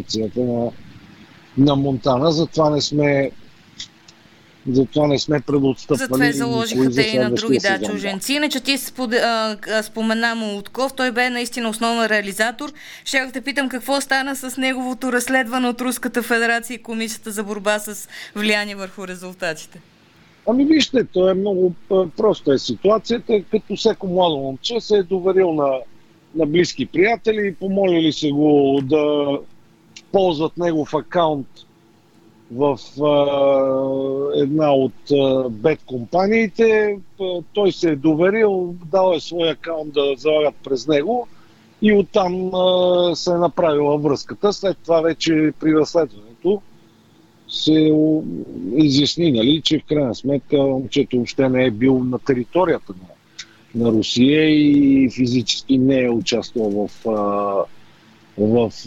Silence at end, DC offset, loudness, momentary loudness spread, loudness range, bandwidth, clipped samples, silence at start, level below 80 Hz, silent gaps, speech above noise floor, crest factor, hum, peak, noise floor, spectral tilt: 0 s; under 0.1%; -18 LUFS; 10 LU; 4 LU; 18.5 kHz; under 0.1%; 0 s; -52 dBFS; none; 34 dB; 16 dB; none; -2 dBFS; -52 dBFS; -5 dB/octave